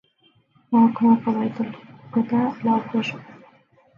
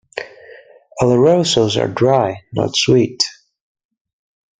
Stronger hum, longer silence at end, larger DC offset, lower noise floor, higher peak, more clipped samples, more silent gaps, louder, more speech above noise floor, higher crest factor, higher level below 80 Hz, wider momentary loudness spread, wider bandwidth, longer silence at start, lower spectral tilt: neither; second, 0.65 s vs 1.25 s; neither; first, -61 dBFS vs -42 dBFS; second, -4 dBFS vs 0 dBFS; neither; neither; second, -22 LUFS vs -15 LUFS; first, 41 dB vs 28 dB; about the same, 18 dB vs 16 dB; second, -70 dBFS vs -50 dBFS; second, 13 LU vs 17 LU; second, 6.6 kHz vs 9.4 kHz; first, 0.7 s vs 0.15 s; first, -8 dB/octave vs -5 dB/octave